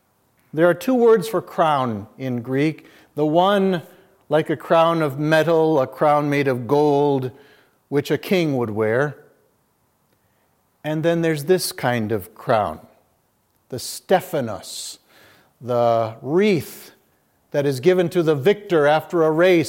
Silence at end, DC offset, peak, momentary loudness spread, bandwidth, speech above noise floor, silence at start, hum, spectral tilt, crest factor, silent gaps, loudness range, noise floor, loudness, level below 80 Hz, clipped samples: 0 s; under 0.1%; -2 dBFS; 13 LU; 17 kHz; 46 dB; 0.55 s; none; -6 dB/octave; 18 dB; none; 6 LU; -65 dBFS; -20 LUFS; -68 dBFS; under 0.1%